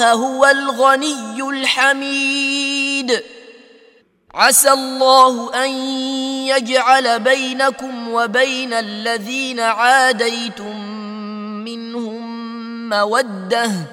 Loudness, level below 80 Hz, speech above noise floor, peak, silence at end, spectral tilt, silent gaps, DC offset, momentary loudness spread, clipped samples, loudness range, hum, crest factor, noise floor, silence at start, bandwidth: -15 LUFS; -68 dBFS; 36 dB; 0 dBFS; 0 s; -2 dB/octave; none; under 0.1%; 16 LU; under 0.1%; 5 LU; none; 16 dB; -51 dBFS; 0 s; 16.5 kHz